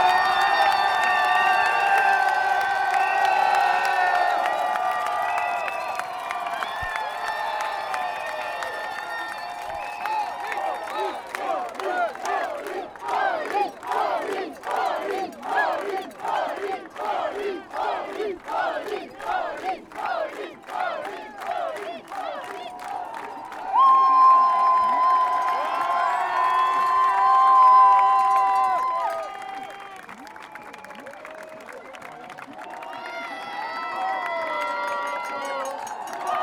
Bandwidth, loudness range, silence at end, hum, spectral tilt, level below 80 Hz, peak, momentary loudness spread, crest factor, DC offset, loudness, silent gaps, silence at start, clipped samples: 17.5 kHz; 13 LU; 0 s; none; -2 dB/octave; -64 dBFS; -6 dBFS; 17 LU; 16 dB; under 0.1%; -23 LUFS; none; 0 s; under 0.1%